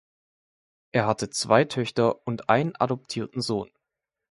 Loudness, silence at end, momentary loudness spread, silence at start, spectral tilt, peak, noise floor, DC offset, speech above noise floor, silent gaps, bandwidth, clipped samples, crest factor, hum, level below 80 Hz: -25 LUFS; 0.7 s; 9 LU; 0.95 s; -5 dB/octave; -4 dBFS; -86 dBFS; under 0.1%; 61 dB; none; 11.5 kHz; under 0.1%; 22 dB; none; -62 dBFS